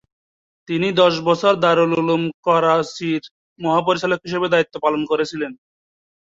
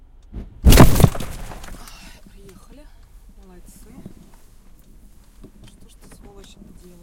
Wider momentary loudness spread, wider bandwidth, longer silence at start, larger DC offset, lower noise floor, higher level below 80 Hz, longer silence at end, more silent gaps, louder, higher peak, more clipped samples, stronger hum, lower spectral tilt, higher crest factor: second, 9 LU vs 31 LU; second, 7.8 kHz vs 17 kHz; first, 0.7 s vs 0.35 s; neither; first, under -90 dBFS vs -45 dBFS; second, -62 dBFS vs -26 dBFS; second, 0.85 s vs 5.3 s; first, 2.34-2.43 s, 3.31-3.56 s vs none; second, -18 LUFS vs -15 LUFS; about the same, -2 dBFS vs 0 dBFS; second, under 0.1% vs 0.1%; neither; about the same, -5.5 dB/octave vs -5.5 dB/octave; about the same, 18 dB vs 20 dB